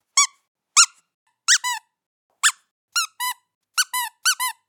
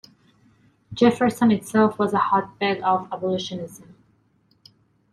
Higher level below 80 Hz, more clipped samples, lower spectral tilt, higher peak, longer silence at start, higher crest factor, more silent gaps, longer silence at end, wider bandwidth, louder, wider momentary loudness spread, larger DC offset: second, -82 dBFS vs -62 dBFS; neither; second, 8.5 dB/octave vs -6 dB/octave; first, 0 dBFS vs -6 dBFS; second, 0.15 s vs 0.9 s; first, 24 dB vs 18 dB; first, 0.48-0.55 s, 1.14-1.26 s, 2.06-2.30 s, 2.71-2.88 s, 3.55-3.61 s vs none; second, 0.15 s vs 1.35 s; first, 19 kHz vs 13.5 kHz; about the same, -20 LUFS vs -21 LUFS; about the same, 12 LU vs 13 LU; neither